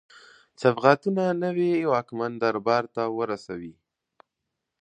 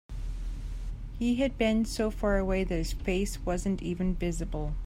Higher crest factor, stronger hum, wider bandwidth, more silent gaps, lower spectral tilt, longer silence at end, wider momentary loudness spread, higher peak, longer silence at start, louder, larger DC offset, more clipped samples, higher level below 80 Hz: first, 24 dB vs 16 dB; neither; second, 9.2 kHz vs 16 kHz; neither; about the same, -7 dB/octave vs -6 dB/octave; first, 1.1 s vs 0 s; about the same, 12 LU vs 13 LU; first, -2 dBFS vs -14 dBFS; first, 0.6 s vs 0.1 s; first, -25 LUFS vs -31 LUFS; neither; neither; second, -70 dBFS vs -36 dBFS